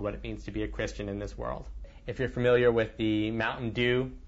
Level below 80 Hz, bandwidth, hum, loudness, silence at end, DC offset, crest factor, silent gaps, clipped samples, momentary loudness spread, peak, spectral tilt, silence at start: -44 dBFS; 8 kHz; none; -30 LUFS; 0 s; under 0.1%; 16 dB; none; under 0.1%; 15 LU; -14 dBFS; -6.5 dB/octave; 0 s